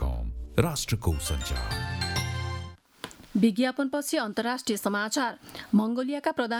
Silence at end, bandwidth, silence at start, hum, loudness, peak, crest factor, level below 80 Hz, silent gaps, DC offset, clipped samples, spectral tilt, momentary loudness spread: 0 s; 19.5 kHz; 0 s; none; -28 LUFS; -8 dBFS; 20 dB; -38 dBFS; none; under 0.1%; under 0.1%; -5 dB/octave; 10 LU